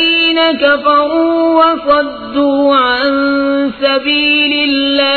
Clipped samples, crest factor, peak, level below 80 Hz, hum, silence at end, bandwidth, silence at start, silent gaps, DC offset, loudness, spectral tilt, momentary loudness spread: under 0.1%; 12 dB; 0 dBFS; -46 dBFS; none; 0 s; 4.6 kHz; 0 s; none; under 0.1%; -11 LUFS; -5.5 dB/octave; 4 LU